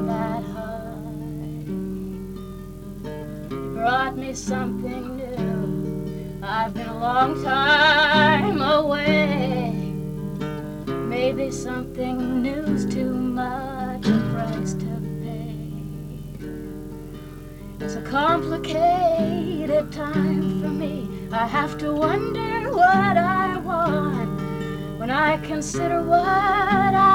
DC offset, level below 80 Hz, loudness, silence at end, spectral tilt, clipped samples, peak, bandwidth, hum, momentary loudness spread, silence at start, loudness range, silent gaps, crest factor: under 0.1%; -44 dBFS; -23 LUFS; 0 s; -5.5 dB/octave; under 0.1%; -4 dBFS; 18 kHz; none; 16 LU; 0 s; 9 LU; none; 18 dB